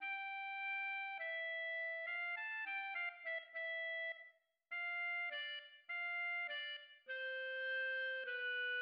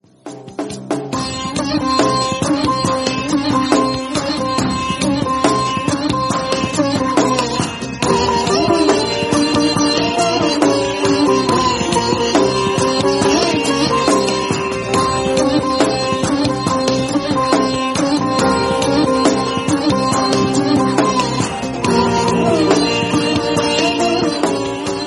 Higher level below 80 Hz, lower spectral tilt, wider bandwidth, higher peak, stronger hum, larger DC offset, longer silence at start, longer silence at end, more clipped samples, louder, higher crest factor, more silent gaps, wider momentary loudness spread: second, under -90 dBFS vs -42 dBFS; second, 8.5 dB/octave vs -4.5 dB/octave; second, 5.6 kHz vs 12 kHz; second, -34 dBFS vs 0 dBFS; neither; neither; second, 0 s vs 0.25 s; about the same, 0 s vs 0 s; neither; second, -42 LUFS vs -15 LUFS; second, 10 dB vs 16 dB; neither; about the same, 7 LU vs 5 LU